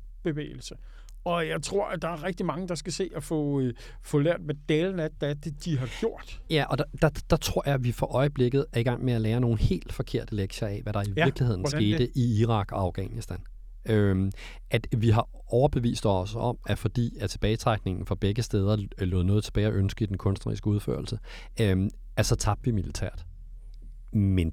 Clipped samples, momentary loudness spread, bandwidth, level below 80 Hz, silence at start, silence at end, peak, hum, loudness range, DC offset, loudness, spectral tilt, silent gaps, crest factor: under 0.1%; 9 LU; 15 kHz; -40 dBFS; 0 s; 0 s; -8 dBFS; none; 3 LU; under 0.1%; -28 LUFS; -6.5 dB/octave; none; 18 dB